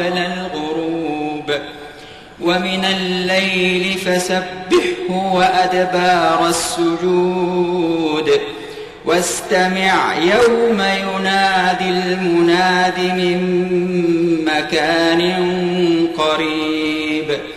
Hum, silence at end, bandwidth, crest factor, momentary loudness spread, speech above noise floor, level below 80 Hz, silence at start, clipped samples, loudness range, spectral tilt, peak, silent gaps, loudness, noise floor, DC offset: none; 0 s; 14.5 kHz; 12 dB; 8 LU; 21 dB; -50 dBFS; 0 s; under 0.1%; 3 LU; -4.5 dB/octave; -4 dBFS; none; -16 LUFS; -37 dBFS; 0.1%